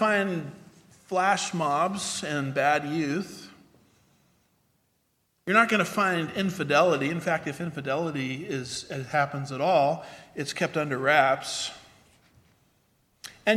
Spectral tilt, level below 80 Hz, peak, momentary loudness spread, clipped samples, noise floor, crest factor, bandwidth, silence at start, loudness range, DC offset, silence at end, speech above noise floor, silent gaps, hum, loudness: -4.5 dB/octave; -68 dBFS; -4 dBFS; 13 LU; under 0.1%; -72 dBFS; 22 dB; 15.5 kHz; 0 s; 4 LU; under 0.1%; 0 s; 46 dB; none; none; -26 LUFS